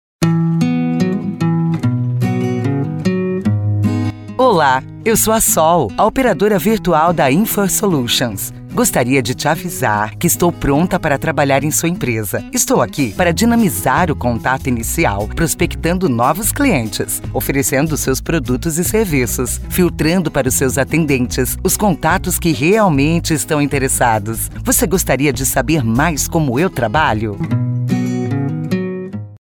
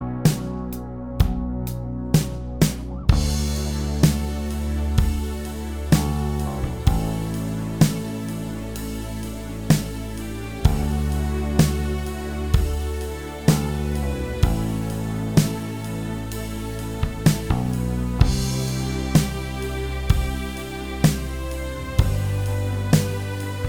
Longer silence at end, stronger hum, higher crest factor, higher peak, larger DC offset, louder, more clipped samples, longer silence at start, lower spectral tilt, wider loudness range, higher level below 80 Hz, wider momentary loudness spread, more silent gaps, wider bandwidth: about the same, 0.05 s vs 0 s; neither; second, 14 dB vs 22 dB; about the same, 0 dBFS vs 0 dBFS; second, under 0.1% vs 0.4%; first, -15 LUFS vs -24 LUFS; neither; first, 0.2 s vs 0 s; second, -4.5 dB/octave vs -6 dB/octave; about the same, 3 LU vs 2 LU; about the same, -32 dBFS vs -28 dBFS; second, 6 LU vs 10 LU; neither; about the same, 19 kHz vs 19 kHz